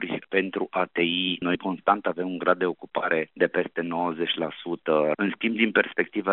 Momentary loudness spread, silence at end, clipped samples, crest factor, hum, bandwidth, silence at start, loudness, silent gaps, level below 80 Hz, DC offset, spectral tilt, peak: 5 LU; 0 s; under 0.1%; 22 dB; none; 4.2 kHz; 0 s; -25 LUFS; none; -72 dBFS; under 0.1%; -2.5 dB/octave; -4 dBFS